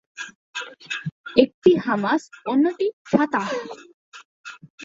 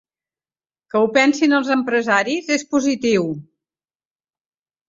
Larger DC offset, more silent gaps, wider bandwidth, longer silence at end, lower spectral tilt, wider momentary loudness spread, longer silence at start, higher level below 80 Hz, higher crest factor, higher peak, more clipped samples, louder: neither; first, 0.35-0.53 s, 1.12-1.24 s, 1.54-1.62 s, 2.93-3.05 s, 3.94-4.12 s, 4.25-4.44 s, 4.70-4.78 s vs none; about the same, 7.8 kHz vs 7.8 kHz; second, 0 s vs 1.45 s; first, -5.5 dB/octave vs -4 dB/octave; first, 22 LU vs 7 LU; second, 0.2 s vs 0.95 s; about the same, -64 dBFS vs -64 dBFS; about the same, 22 dB vs 18 dB; about the same, -2 dBFS vs -2 dBFS; neither; second, -22 LUFS vs -18 LUFS